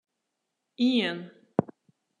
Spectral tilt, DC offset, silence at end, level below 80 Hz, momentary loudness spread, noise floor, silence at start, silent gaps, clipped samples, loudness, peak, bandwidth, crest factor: -6.5 dB/octave; under 0.1%; 0.55 s; -74 dBFS; 14 LU; -82 dBFS; 0.8 s; none; under 0.1%; -28 LUFS; -6 dBFS; 9.6 kHz; 26 dB